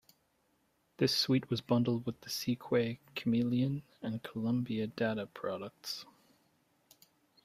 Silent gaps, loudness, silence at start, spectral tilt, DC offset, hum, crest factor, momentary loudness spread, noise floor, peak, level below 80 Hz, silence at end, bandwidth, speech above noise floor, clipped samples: none; -34 LUFS; 1 s; -5.5 dB/octave; under 0.1%; none; 18 dB; 10 LU; -75 dBFS; -18 dBFS; -72 dBFS; 1.4 s; 15.5 kHz; 41 dB; under 0.1%